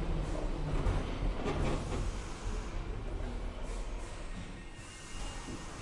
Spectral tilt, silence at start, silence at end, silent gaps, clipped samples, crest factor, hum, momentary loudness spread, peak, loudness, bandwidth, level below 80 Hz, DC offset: -5.5 dB/octave; 0 s; 0 s; none; under 0.1%; 16 dB; none; 10 LU; -20 dBFS; -40 LUFS; 11.5 kHz; -38 dBFS; under 0.1%